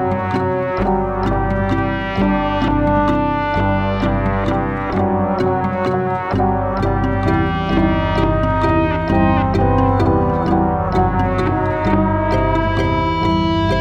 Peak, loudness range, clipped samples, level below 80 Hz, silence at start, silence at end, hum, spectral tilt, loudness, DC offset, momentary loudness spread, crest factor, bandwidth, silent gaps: -2 dBFS; 2 LU; under 0.1%; -26 dBFS; 0 s; 0 s; none; -8.5 dB/octave; -17 LUFS; under 0.1%; 3 LU; 14 dB; 7.4 kHz; none